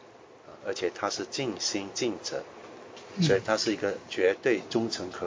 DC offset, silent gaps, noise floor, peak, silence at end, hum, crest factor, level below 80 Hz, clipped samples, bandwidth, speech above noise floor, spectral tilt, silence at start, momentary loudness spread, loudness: under 0.1%; none; -51 dBFS; -10 dBFS; 0 s; none; 20 dB; -64 dBFS; under 0.1%; 7.6 kHz; 22 dB; -4 dB/octave; 0 s; 15 LU; -29 LUFS